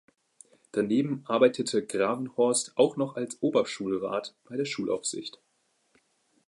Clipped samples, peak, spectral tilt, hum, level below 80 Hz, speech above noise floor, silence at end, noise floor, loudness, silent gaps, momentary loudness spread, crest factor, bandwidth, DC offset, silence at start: under 0.1%; -8 dBFS; -4 dB/octave; none; -74 dBFS; 45 dB; 1.2 s; -72 dBFS; -28 LUFS; none; 10 LU; 20 dB; 11.5 kHz; under 0.1%; 0.75 s